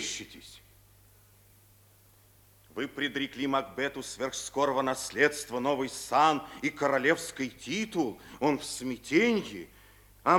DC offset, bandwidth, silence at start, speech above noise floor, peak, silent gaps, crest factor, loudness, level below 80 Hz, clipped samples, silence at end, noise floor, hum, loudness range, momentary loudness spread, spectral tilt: under 0.1%; over 20 kHz; 0 s; 30 dB; -10 dBFS; none; 22 dB; -30 LUFS; -64 dBFS; under 0.1%; 0 s; -60 dBFS; none; 8 LU; 13 LU; -3.5 dB/octave